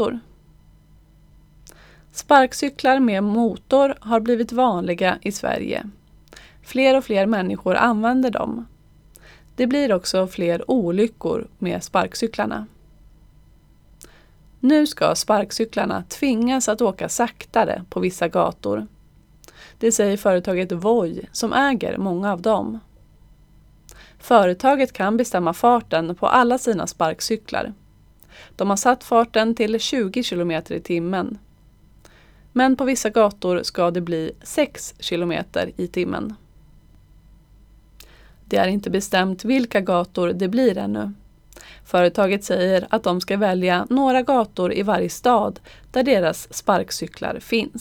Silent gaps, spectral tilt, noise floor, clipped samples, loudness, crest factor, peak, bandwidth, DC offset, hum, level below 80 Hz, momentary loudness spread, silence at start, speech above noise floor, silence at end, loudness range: none; -4.5 dB/octave; -52 dBFS; under 0.1%; -20 LUFS; 22 dB; 0 dBFS; 19.5 kHz; under 0.1%; none; -52 dBFS; 9 LU; 0 s; 32 dB; 0 s; 5 LU